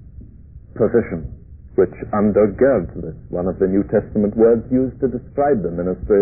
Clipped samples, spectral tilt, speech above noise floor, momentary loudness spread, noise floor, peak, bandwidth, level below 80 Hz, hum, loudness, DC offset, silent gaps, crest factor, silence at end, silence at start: under 0.1%; -16 dB/octave; 23 dB; 13 LU; -40 dBFS; -4 dBFS; 2.6 kHz; -38 dBFS; none; -18 LUFS; 0.2%; none; 14 dB; 0 s; 0 s